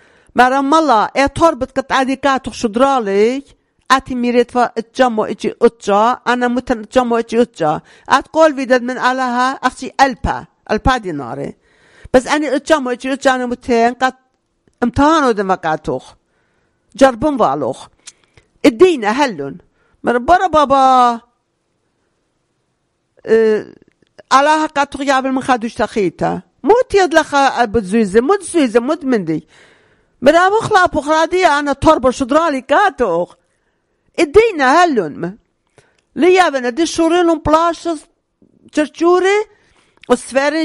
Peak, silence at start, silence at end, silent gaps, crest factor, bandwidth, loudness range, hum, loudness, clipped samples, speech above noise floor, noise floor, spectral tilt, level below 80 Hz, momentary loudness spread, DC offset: 0 dBFS; 0.35 s; 0 s; none; 14 dB; 13.5 kHz; 3 LU; none; -14 LUFS; 0.3%; 53 dB; -66 dBFS; -4.5 dB/octave; -40 dBFS; 10 LU; under 0.1%